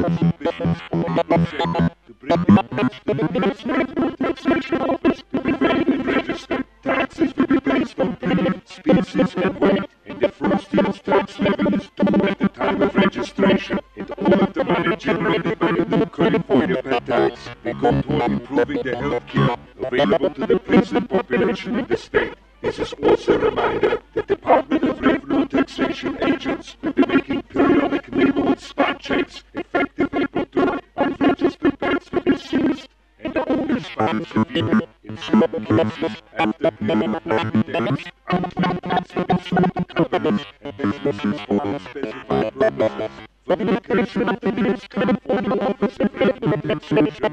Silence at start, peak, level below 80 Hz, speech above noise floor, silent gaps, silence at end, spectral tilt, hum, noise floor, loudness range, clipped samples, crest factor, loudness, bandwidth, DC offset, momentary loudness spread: 0 s; -2 dBFS; -46 dBFS; 22 dB; none; 0 s; -7.5 dB/octave; none; -42 dBFS; 2 LU; under 0.1%; 18 dB; -20 LUFS; 8.8 kHz; under 0.1%; 7 LU